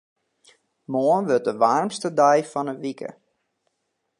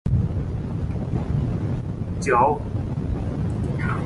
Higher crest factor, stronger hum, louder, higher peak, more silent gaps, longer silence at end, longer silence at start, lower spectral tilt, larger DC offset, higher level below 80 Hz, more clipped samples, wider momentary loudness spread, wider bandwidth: about the same, 20 dB vs 18 dB; neither; first, -22 LUFS vs -25 LUFS; about the same, -4 dBFS vs -6 dBFS; neither; first, 1.1 s vs 0 s; first, 0.9 s vs 0.05 s; second, -5.5 dB/octave vs -8 dB/octave; neither; second, -78 dBFS vs -32 dBFS; neither; first, 13 LU vs 9 LU; about the same, 11.5 kHz vs 11.5 kHz